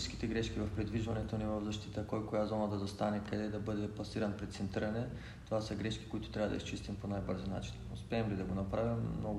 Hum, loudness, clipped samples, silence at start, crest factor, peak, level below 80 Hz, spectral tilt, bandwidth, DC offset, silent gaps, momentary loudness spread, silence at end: none; -39 LUFS; under 0.1%; 0 s; 16 dB; -22 dBFS; -52 dBFS; -6.5 dB/octave; 12 kHz; under 0.1%; none; 6 LU; 0 s